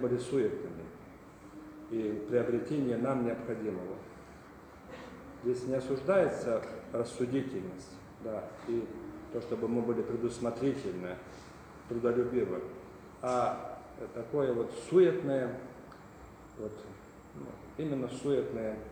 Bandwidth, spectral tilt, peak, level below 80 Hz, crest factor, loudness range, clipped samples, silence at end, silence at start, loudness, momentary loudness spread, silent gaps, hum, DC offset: 15.5 kHz; -7 dB/octave; -14 dBFS; -62 dBFS; 20 dB; 5 LU; under 0.1%; 0 s; 0 s; -34 LUFS; 20 LU; none; none; under 0.1%